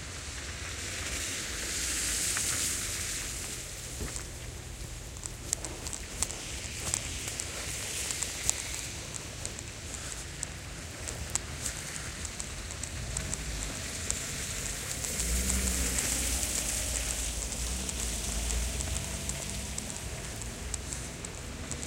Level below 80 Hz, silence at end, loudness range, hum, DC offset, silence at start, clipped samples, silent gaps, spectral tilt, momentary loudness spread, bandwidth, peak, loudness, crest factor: -42 dBFS; 0 s; 7 LU; none; under 0.1%; 0 s; under 0.1%; none; -2 dB/octave; 10 LU; 17 kHz; -4 dBFS; -33 LUFS; 32 dB